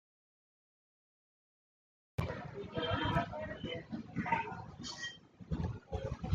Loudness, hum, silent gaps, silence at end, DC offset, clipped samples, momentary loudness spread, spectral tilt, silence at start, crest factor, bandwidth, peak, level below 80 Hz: -40 LUFS; none; none; 0 s; under 0.1%; under 0.1%; 9 LU; -5.5 dB/octave; 2.2 s; 22 dB; 10.5 kHz; -20 dBFS; -54 dBFS